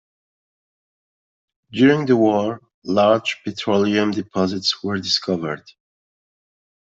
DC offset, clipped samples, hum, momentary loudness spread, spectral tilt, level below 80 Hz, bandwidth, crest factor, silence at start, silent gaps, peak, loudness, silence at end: under 0.1%; under 0.1%; none; 11 LU; -5 dB/octave; -64 dBFS; 7.8 kHz; 18 dB; 1.7 s; 2.74-2.82 s; -4 dBFS; -19 LUFS; 1.4 s